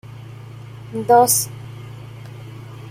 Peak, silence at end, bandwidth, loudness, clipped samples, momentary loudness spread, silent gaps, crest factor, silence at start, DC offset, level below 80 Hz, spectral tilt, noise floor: -2 dBFS; 0 s; 16 kHz; -16 LUFS; under 0.1%; 24 LU; none; 20 dB; 0.1 s; under 0.1%; -56 dBFS; -3.5 dB/octave; -36 dBFS